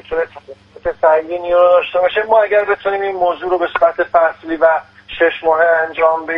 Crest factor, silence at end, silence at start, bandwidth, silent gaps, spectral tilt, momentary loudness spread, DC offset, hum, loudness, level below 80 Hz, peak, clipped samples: 14 dB; 0 s; 0.1 s; 5.4 kHz; none; -6 dB/octave; 9 LU; under 0.1%; none; -14 LUFS; -48 dBFS; 0 dBFS; under 0.1%